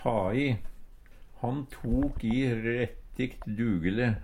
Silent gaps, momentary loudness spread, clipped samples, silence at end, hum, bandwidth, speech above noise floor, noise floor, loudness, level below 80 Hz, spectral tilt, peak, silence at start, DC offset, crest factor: none; 7 LU; under 0.1%; 0 s; none; 15.5 kHz; 20 dB; -49 dBFS; -31 LUFS; -42 dBFS; -8 dB/octave; -12 dBFS; 0 s; under 0.1%; 18 dB